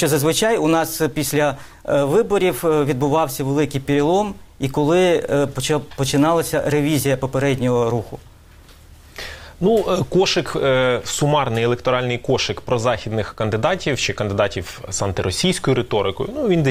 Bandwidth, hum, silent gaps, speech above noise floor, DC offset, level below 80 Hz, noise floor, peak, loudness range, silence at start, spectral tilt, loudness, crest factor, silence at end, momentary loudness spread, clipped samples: 16 kHz; none; none; 26 dB; 0.1%; -44 dBFS; -45 dBFS; -2 dBFS; 3 LU; 0 s; -5 dB/octave; -19 LUFS; 16 dB; 0 s; 7 LU; under 0.1%